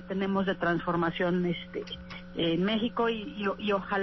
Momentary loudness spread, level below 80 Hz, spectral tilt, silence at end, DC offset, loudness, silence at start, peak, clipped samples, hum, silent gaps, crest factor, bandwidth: 10 LU; -54 dBFS; -7.5 dB/octave; 0 s; under 0.1%; -30 LUFS; 0 s; -16 dBFS; under 0.1%; none; none; 14 dB; 6 kHz